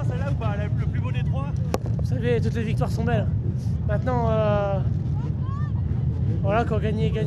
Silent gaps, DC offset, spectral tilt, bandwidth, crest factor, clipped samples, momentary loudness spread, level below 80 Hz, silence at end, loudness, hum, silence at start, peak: none; under 0.1%; -8.5 dB/octave; 11.5 kHz; 16 dB; under 0.1%; 4 LU; -34 dBFS; 0 s; -24 LUFS; none; 0 s; -6 dBFS